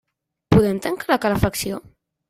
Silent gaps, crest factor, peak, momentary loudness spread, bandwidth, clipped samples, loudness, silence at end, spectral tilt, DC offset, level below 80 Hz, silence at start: none; 20 dB; -2 dBFS; 10 LU; 16 kHz; under 0.1%; -20 LUFS; 0.5 s; -6 dB/octave; under 0.1%; -40 dBFS; 0.5 s